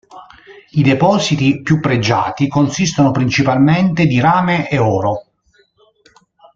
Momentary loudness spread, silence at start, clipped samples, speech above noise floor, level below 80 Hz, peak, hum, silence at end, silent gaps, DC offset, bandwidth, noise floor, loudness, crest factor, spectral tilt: 4 LU; 0.15 s; under 0.1%; 43 dB; -46 dBFS; 0 dBFS; none; 1.35 s; none; under 0.1%; 7.6 kHz; -56 dBFS; -14 LUFS; 14 dB; -6 dB/octave